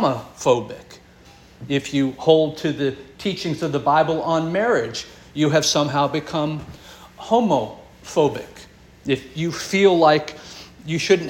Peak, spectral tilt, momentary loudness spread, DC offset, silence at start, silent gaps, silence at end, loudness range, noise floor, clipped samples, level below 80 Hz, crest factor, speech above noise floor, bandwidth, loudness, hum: -2 dBFS; -5 dB/octave; 19 LU; under 0.1%; 0 s; none; 0 s; 3 LU; -48 dBFS; under 0.1%; -54 dBFS; 20 dB; 28 dB; 17 kHz; -20 LUFS; none